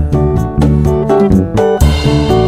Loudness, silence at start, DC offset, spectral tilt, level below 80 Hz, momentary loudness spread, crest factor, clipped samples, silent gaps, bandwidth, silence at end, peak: -11 LUFS; 0 s; under 0.1%; -7.5 dB/octave; -18 dBFS; 3 LU; 10 dB; 0.3%; none; 15.5 kHz; 0 s; 0 dBFS